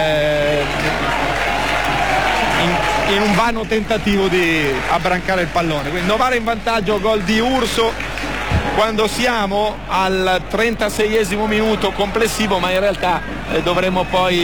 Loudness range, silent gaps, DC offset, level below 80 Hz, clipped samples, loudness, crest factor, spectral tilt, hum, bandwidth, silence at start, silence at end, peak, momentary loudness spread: 1 LU; none; 2%; -32 dBFS; under 0.1%; -17 LUFS; 10 dB; -4.5 dB/octave; none; over 20 kHz; 0 s; 0 s; -6 dBFS; 4 LU